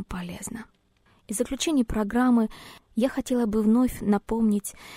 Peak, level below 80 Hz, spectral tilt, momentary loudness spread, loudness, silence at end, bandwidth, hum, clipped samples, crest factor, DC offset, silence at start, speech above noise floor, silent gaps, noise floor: -10 dBFS; -44 dBFS; -5 dB/octave; 13 LU; -25 LUFS; 0 s; 16 kHz; none; under 0.1%; 16 dB; under 0.1%; 0 s; 38 dB; none; -63 dBFS